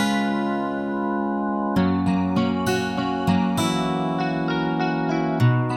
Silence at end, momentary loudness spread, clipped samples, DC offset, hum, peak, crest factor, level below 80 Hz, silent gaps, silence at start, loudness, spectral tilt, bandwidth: 0 s; 4 LU; under 0.1%; under 0.1%; none; -8 dBFS; 14 dB; -52 dBFS; none; 0 s; -23 LUFS; -6.5 dB/octave; 17 kHz